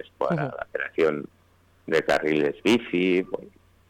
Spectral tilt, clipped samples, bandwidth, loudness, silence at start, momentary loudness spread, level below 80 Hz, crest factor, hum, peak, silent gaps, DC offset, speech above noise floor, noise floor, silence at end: -6 dB/octave; under 0.1%; 17.5 kHz; -25 LUFS; 0.2 s; 13 LU; -60 dBFS; 12 dB; none; -14 dBFS; none; under 0.1%; 35 dB; -60 dBFS; 0.4 s